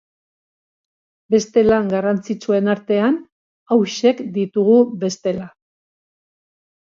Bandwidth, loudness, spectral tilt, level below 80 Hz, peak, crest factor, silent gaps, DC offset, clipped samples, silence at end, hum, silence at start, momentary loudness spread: 7.6 kHz; -18 LUFS; -6 dB/octave; -54 dBFS; -2 dBFS; 16 dB; 3.32-3.66 s; under 0.1%; under 0.1%; 1.35 s; none; 1.3 s; 9 LU